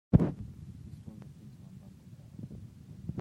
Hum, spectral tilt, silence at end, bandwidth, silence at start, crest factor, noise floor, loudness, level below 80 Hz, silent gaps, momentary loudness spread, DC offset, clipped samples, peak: none; -10.5 dB/octave; 0 s; 9.6 kHz; 0.1 s; 28 dB; -52 dBFS; -36 LUFS; -48 dBFS; none; 21 LU; under 0.1%; under 0.1%; -8 dBFS